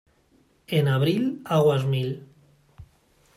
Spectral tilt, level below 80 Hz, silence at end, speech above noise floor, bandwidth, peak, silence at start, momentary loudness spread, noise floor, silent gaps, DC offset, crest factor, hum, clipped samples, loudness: -7.5 dB/octave; -62 dBFS; 0.5 s; 40 dB; 14.5 kHz; -10 dBFS; 0.7 s; 8 LU; -62 dBFS; none; under 0.1%; 16 dB; none; under 0.1%; -23 LUFS